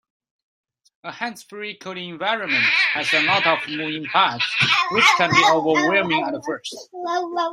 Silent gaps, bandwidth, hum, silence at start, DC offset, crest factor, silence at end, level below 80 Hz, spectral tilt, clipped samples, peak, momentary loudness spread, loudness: none; 16 kHz; none; 1.05 s; under 0.1%; 20 dB; 0 s; -66 dBFS; -3 dB/octave; under 0.1%; 0 dBFS; 16 LU; -18 LUFS